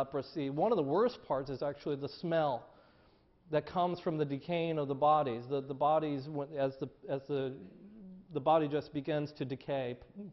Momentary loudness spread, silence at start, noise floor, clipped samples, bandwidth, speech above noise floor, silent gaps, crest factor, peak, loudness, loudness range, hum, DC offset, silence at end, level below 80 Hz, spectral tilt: 12 LU; 0 s; -66 dBFS; under 0.1%; 6 kHz; 32 dB; none; 18 dB; -16 dBFS; -35 LUFS; 3 LU; none; under 0.1%; 0 s; -68 dBFS; -5.5 dB/octave